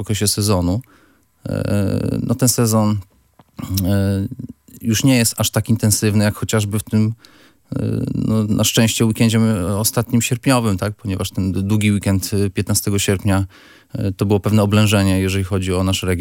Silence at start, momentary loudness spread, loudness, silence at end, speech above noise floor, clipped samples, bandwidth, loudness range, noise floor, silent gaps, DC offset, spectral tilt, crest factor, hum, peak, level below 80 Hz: 0 s; 10 LU; -18 LUFS; 0 s; 21 dB; under 0.1%; 17 kHz; 2 LU; -38 dBFS; none; under 0.1%; -5 dB/octave; 18 dB; none; 0 dBFS; -48 dBFS